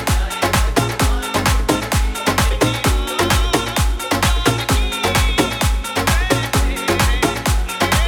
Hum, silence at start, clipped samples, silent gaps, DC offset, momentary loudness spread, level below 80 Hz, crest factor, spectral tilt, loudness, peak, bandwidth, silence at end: none; 0 s; under 0.1%; none; under 0.1%; 3 LU; -20 dBFS; 16 dB; -4 dB/octave; -17 LUFS; 0 dBFS; 19.5 kHz; 0 s